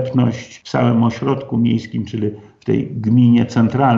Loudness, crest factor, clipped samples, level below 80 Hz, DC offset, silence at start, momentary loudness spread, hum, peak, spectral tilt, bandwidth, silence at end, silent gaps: -17 LUFS; 14 dB; under 0.1%; -52 dBFS; under 0.1%; 0 s; 11 LU; none; -2 dBFS; -8 dB/octave; 7.2 kHz; 0 s; none